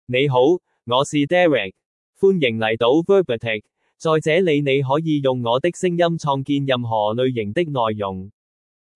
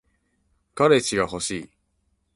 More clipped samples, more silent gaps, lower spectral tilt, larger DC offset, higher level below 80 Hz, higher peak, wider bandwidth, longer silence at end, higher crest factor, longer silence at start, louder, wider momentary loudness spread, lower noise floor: neither; first, 1.86-2.13 s vs none; first, -6 dB/octave vs -4 dB/octave; neither; second, -64 dBFS vs -56 dBFS; about the same, -4 dBFS vs -4 dBFS; about the same, 11.5 kHz vs 11.5 kHz; about the same, 0.65 s vs 0.7 s; about the same, 16 dB vs 20 dB; second, 0.1 s vs 0.75 s; first, -19 LUFS vs -22 LUFS; second, 7 LU vs 15 LU; first, under -90 dBFS vs -70 dBFS